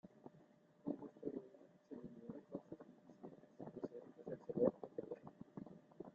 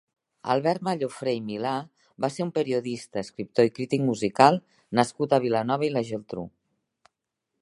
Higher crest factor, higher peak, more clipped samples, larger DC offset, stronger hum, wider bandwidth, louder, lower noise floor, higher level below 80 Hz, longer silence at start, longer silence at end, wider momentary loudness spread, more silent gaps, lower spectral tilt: about the same, 28 dB vs 26 dB; second, -22 dBFS vs -2 dBFS; neither; neither; neither; second, 7.2 kHz vs 11.5 kHz; second, -49 LUFS vs -26 LUFS; second, -69 dBFS vs -83 dBFS; second, -82 dBFS vs -68 dBFS; second, 0.05 s vs 0.45 s; second, 0 s vs 1.15 s; first, 22 LU vs 13 LU; neither; first, -9.5 dB/octave vs -6 dB/octave